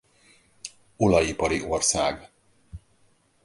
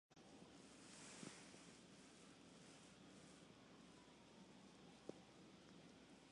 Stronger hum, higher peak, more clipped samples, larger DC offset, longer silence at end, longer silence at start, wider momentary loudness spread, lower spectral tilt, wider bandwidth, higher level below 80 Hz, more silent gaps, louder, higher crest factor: neither; first, -6 dBFS vs -38 dBFS; neither; neither; first, 0.7 s vs 0 s; first, 0.65 s vs 0.1 s; first, 20 LU vs 7 LU; about the same, -3.5 dB/octave vs -3.5 dB/octave; about the same, 11.5 kHz vs 11 kHz; first, -46 dBFS vs -86 dBFS; neither; first, -23 LUFS vs -63 LUFS; second, 20 dB vs 26 dB